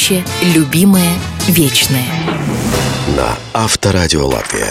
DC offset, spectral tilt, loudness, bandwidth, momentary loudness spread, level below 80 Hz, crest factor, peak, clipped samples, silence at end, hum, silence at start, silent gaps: under 0.1%; -4 dB/octave; -12 LUFS; 16.5 kHz; 7 LU; -30 dBFS; 12 dB; 0 dBFS; under 0.1%; 0 s; none; 0 s; none